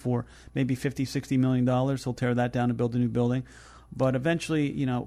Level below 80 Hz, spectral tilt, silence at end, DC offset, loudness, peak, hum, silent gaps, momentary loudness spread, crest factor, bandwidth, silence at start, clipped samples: -54 dBFS; -7 dB/octave; 0 s; under 0.1%; -27 LUFS; -12 dBFS; none; none; 7 LU; 14 dB; 13.5 kHz; 0 s; under 0.1%